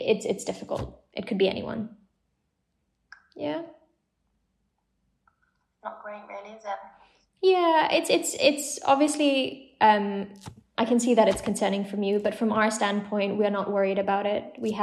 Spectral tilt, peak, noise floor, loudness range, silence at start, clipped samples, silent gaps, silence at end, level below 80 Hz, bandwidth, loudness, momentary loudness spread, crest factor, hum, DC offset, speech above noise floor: -4 dB/octave; -6 dBFS; -76 dBFS; 18 LU; 0 s; under 0.1%; none; 0 s; -60 dBFS; 13.5 kHz; -25 LUFS; 18 LU; 20 dB; none; under 0.1%; 51 dB